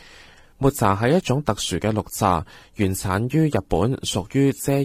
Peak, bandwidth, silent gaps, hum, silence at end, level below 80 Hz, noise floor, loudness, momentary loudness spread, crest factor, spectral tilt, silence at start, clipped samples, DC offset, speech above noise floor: -4 dBFS; 16 kHz; none; none; 0 s; -42 dBFS; -48 dBFS; -22 LUFS; 5 LU; 18 dB; -5.5 dB/octave; 0.6 s; under 0.1%; under 0.1%; 27 dB